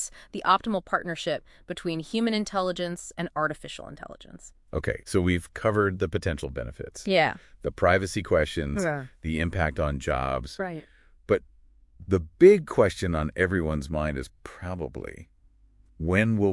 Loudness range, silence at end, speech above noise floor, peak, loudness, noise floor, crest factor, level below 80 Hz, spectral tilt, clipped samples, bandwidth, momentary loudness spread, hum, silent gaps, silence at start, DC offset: 6 LU; 0 s; 32 dB; -4 dBFS; -27 LUFS; -58 dBFS; 22 dB; -44 dBFS; -6 dB/octave; under 0.1%; 12 kHz; 14 LU; none; none; 0 s; under 0.1%